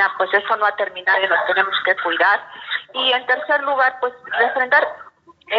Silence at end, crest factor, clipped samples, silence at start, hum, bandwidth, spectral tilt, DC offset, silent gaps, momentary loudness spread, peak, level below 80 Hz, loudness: 0 s; 18 dB; under 0.1%; 0 s; none; 6.8 kHz; 3 dB/octave; under 0.1%; none; 7 LU; -2 dBFS; -72 dBFS; -18 LUFS